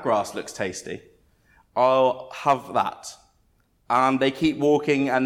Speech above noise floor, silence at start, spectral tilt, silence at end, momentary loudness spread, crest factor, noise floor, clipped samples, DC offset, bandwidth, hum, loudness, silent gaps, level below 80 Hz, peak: 42 dB; 0 s; -5 dB/octave; 0 s; 15 LU; 16 dB; -64 dBFS; under 0.1%; under 0.1%; 15 kHz; none; -23 LUFS; none; -60 dBFS; -6 dBFS